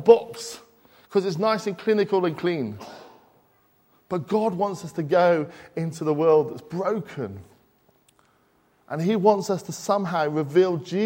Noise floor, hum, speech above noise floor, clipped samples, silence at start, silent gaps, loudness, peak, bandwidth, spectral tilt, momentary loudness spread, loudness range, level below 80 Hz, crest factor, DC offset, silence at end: -63 dBFS; none; 40 dB; under 0.1%; 0 s; none; -24 LUFS; -2 dBFS; 16.5 kHz; -6.5 dB/octave; 15 LU; 3 LU; -68 dBFS; 22 dB; under 0.1%; 0 s